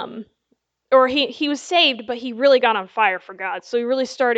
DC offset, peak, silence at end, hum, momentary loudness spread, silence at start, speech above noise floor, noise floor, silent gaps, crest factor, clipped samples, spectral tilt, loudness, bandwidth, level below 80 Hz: under 0.1%; -2 dBFS; 0 s; none; 12 LU; 0 s; 50 dB; -69 dBFS; none; 18 dB; under 0.1%; -2.5 dB/octave; -19 LUFS; 8.2 kHz; -66 dBFS